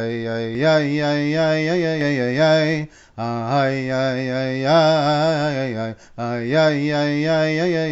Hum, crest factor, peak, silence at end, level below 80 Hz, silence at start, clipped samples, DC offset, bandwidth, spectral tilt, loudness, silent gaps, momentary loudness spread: none; 14 dB; -4 dBFS; 0 s; -56 dBFS; 0 s; under 0.1%; under 0.1%; 8 kHz; -5 dB/octave; -19 LUFS; none; 10 LU